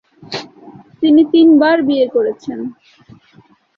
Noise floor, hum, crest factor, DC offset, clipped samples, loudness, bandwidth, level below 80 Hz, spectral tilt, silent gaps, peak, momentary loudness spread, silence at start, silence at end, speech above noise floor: -49 dBFS; none; 12 dB; under 0.1%; under 0.1%; -12 LUFS; 6.6 kHz; -60 dBFS; -6 dB/octave; none; -2 dBFS; 18 LU; 0.3 s; 1.05 s; 37 dB